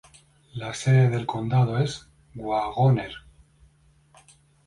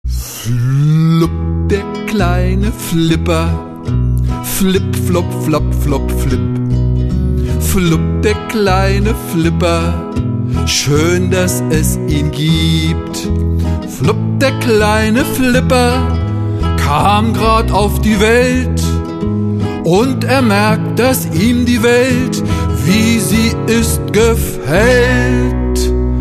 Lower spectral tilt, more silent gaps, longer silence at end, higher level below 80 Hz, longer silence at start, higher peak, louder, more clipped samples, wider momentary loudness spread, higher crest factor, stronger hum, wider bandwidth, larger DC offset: first, -7 dB/octave vs -5.5 dB/octave; neither; first, 1.5 s vs 0 s; second, -56 dBFS vs -22 dBFS; first, 0.55 s vs 0.05 s; second, -10 dBFS vs 0 dBFS; second, -24 LUFS vs -13 LUFS; neither; first, 19 LU vs 6 LU; about the same, 16 dB vs 12 dB; neither; second, 11 kHz vs 14 kHz; neither